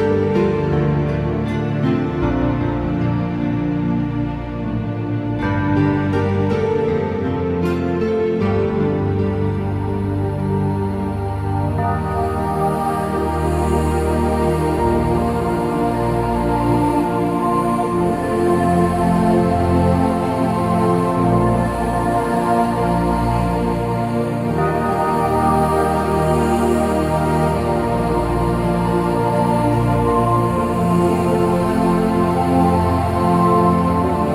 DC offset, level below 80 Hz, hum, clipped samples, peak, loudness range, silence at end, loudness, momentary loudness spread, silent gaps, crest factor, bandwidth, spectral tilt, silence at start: under 0.1%; -32 dBFS; none; under 0.1%; -4 dBFS; 4 LU; 0 s; -18 LUFS; 5 LU; none; 14 dB; 15.5 kHz; -8 dB/octave; 0 s